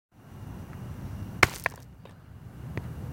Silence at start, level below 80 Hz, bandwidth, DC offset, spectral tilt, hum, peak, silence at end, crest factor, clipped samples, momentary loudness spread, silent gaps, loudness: 0.15 s; -48 dBFS; 17 kHz; under 0.1%; -4 dB/octave; none; 0 dBFS; 0 s; 34 dB; under 0.1%; 25 LU; none; -30 LUFS